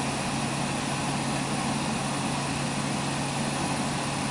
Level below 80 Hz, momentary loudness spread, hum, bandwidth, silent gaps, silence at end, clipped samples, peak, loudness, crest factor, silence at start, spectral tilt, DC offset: -52 dBFS; 1 LU; none; 11.5 kHz; none; 0 s; under 0.1%; -16 dBFS; -28 LUFS; 12 dB; 0 s; -4 dB/octave; under 0.1%